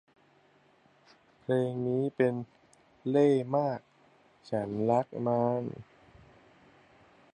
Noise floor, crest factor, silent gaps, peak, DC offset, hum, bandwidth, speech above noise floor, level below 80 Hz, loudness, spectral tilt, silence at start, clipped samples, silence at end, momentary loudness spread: -64 dBFS; 18 dB; none; -14 dBFS; under 0.1%; none; 10 kHz; 36 dB; -70 dBFS; -30 LUFS; -8.5 dB/octave; 1.5 s; under 0.1%; 1.5 s; 16 LU